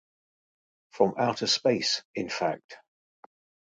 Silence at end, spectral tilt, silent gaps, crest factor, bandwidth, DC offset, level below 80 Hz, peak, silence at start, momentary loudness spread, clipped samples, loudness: 0.9 s; -3.5 dB/octave; 2.05-2.14 s, 2.64-2.69 s; 22 dB; 9.4 kHz; under 0.1%; -72 dBFS; -8 dBFS; 0.95 s; 8 LU; under 0.1%; -27 LUFS